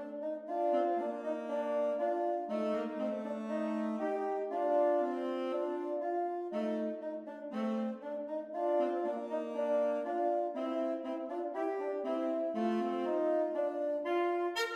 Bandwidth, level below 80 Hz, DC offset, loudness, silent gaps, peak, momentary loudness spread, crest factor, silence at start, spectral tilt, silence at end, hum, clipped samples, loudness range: 12.5 kHz; -86 dBFS; under 0.1%; -35 LUFS; none; -20 dBFS; 6 LU; 14 dB; 0 s; -6 dB/octave; 0 s; none; under 0.1%; 2 LU